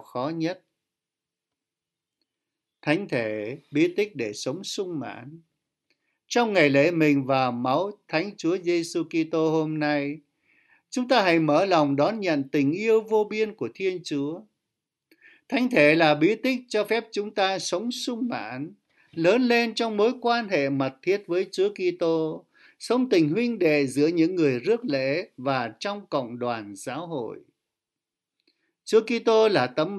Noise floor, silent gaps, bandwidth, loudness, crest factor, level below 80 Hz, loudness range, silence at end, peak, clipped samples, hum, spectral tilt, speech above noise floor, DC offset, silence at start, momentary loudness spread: -88 dBFS; none; 12 kHz; -24 LUFS; 20 dB; -74 dBFS; 7 LU; 0 s; -4 dBFS; under 0.1%; none; -5.5 dB/octave; 64 dB; under 0.1%; 0.15 s; 13 LU